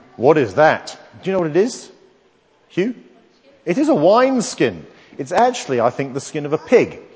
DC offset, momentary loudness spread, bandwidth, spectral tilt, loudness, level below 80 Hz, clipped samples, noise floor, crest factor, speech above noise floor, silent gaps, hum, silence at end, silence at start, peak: under 0.1%; 18 LU; 8 kHz; -5.5 dB/octave; -17 LUFS; -60 dBFS; under 0.1%; -56 dBFS; 18 dB; 39 dB; none; none; 0.15 s; 0.2 s; 0 dBFS